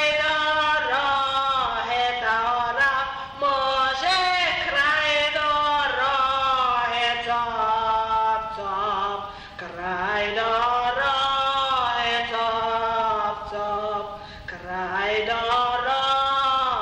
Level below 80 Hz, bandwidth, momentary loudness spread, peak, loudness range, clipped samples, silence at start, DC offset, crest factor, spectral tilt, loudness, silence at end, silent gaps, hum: -50 dBFS; 10.5 kHz; 8 LU; -10 dBFS; 4 LU; under 0.1%; 0 s; under 0.1%; 12 dB; -2.5 dB/octave; -22 LUFS; 0 s; none; none